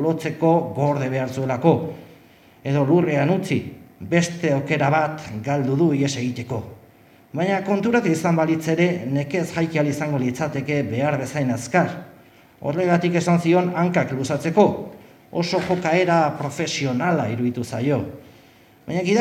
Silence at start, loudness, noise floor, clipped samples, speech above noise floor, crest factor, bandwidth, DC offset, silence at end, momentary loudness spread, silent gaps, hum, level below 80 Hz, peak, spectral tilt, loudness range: 0 s; -21 LUFS; -51 dBFS; under 0.1%; 30 dB; 20 dB; 15 kHz; under 0.1%; 0 s; 11 LU; none; none; -60 dBFS; -2 dBFS; -6.5 dB/octave; 2 LU